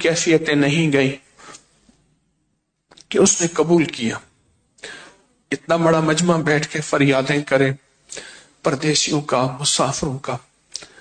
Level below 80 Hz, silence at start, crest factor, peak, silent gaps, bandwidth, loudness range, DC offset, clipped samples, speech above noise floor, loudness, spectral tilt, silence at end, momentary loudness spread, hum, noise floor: -54 dBFS; 0 s; 16 dB; -4 dBFS; none; 9.4 kHz; 2 LU; under 0.1%; under 0.1%; 52 dB; -18 LUFS; -4 dB/octave; 0.15 s; 19 LU; none; -70 dBFS